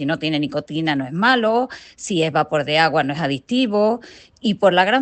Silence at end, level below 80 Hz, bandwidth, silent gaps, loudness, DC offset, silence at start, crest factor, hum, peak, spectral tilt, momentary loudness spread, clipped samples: 0 s; -60 dBFS; 9 kHz; none; -19 LUFS; under 0.1%; 0 s; 18 dB; none; -2 dBFS; -5 dB/octave; 9 LU; under 0.1%